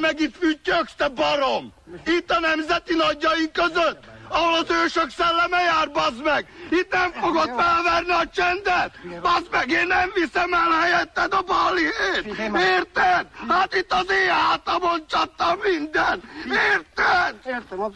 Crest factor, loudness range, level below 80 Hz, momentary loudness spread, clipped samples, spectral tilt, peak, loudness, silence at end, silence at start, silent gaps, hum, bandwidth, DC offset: 12 dB; 2 LU; -50 dBFS; 6 LU; under 0.1%; -3.5 dB/octave; -10 dBFS; -21 LUFS; 0 s; 0 s; none; none; 10 kHz; under 0.1%